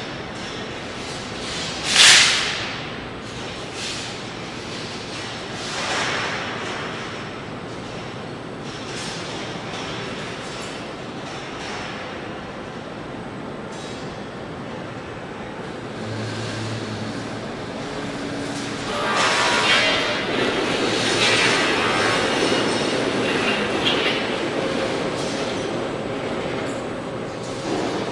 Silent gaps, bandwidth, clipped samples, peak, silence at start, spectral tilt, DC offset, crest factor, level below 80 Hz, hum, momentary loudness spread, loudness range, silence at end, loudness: none; 12 kHz; under 0.1%; 0 dBFS; 0 s; -2.5 dB/octave; under 0.1%; 24 dB; -50 dBFS; none; 15 LU; 14 LU; 0 s; -22 LUFS